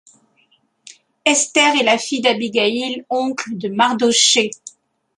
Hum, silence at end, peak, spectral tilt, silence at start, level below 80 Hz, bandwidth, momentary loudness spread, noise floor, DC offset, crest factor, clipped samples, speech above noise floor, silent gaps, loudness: none; 0.5 s; 0 dBFS; -1.5 dB/octave; 1.25 s; -68 dBFS; 11.5 kHz; 11 LU; -60 dBFS; under 0.1%; 18 dB; under 0.1%; 43 dB; none; -16 LUFS